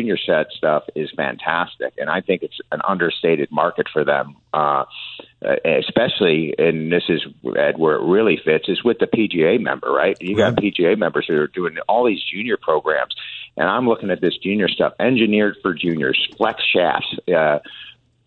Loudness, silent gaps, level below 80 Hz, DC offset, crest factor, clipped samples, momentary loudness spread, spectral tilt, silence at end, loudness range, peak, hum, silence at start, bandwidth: -19 LUFS; none; -58 dBFS; under 0.1%; 18 dB; under 0.1%; 7 LU; -7 dB/octave; 0.35 s; 3 LU; 0 dBFS; none; 0 s; 7.2 kHz